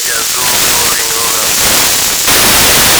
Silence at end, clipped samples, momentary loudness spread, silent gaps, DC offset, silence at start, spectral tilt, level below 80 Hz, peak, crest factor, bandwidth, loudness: 0 s; 4%; 5 LU; none; under 0.1%; 0 s; 0 dB/octave; -32 dBFS; 0 dBFS; 10 dB; over 20 kHz; -7 LUFS